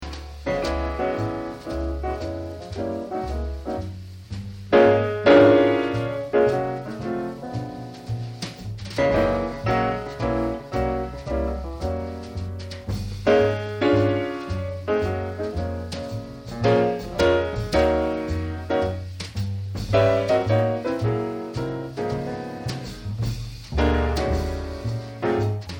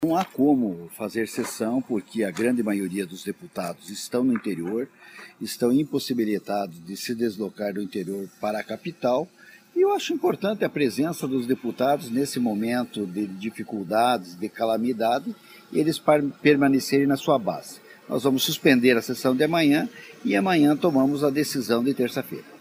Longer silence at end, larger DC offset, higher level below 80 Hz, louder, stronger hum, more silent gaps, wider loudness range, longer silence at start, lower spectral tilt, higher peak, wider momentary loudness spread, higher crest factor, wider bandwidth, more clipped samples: about the same, 0 s vs 0.05 s; neither; first, -36 dBFS vs -68 dBFS; about the same, -24 LUFS vs -24 LUFS; neither; neither; first, 9 LU vs 6 LU; about the same, 0 s vs 0 s; first, -7 dB/octave vs -5 dB/octave; about the same, -4 dBFS vs -2 dBFS; about the same, 13 LU vs 13 LU; about the same, 20 dB vs 22 dB; about the same, 16.5 kHz vs 15.5 kHz; neither